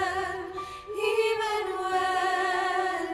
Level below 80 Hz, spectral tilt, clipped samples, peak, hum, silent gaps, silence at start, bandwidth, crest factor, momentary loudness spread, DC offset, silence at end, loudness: -60 dBFS; -3 dB/octave; under 0.1%; -14 dBFS; none; none; 0 s; 16 kHz; 14 dB; 10 LU; under 0.1%; 0 s; -28 LUFS